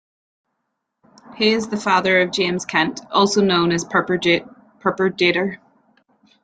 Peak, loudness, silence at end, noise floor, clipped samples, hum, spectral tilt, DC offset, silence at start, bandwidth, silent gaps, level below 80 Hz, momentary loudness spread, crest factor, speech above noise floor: -2 dBFS; -18 LUFS; 0.85 s; -76 dBFS; under 0.1%; none; -4 dB/octave; under 0.1%; 1.3 s; 9.4 kHz; none; -60 dBFS; 6 LU; 18 dB; 58 dB